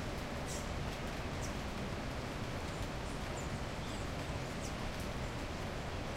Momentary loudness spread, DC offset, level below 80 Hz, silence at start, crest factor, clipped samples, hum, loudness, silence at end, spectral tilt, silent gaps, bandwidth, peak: 1 LU; under 0.1%; -46 dBFS; 0 s; 14 dB; under 0.1%; none; -41 LUFS; 0 s; -5 dB/octave; none; 16 kHz; -28 dBFS